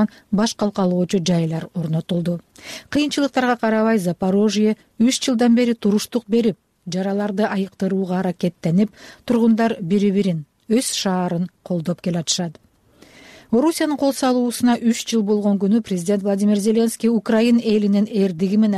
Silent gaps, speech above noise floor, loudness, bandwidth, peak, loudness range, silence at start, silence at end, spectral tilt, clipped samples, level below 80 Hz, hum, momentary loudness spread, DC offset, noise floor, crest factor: none; 32 dB; -19 LUFS; 14.5 kHz; -6 dBFS; 4 LU; 0 s; 0 s; -5.5 dB/octave; under 0.1%; -58 dBFS; none; 7 LU; under 0.1%; -51 dBFS; 12 dB